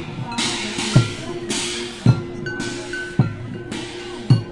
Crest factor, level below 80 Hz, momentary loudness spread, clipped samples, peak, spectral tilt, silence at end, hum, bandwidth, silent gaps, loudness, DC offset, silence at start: 20 dB; -44 dBFS; 11 LU; under 0.1%; -2 dBFS; -5 dB/octave; 0 s; none; 11.5 kHz; none; -22 LUFS; under 0.1%; 0 s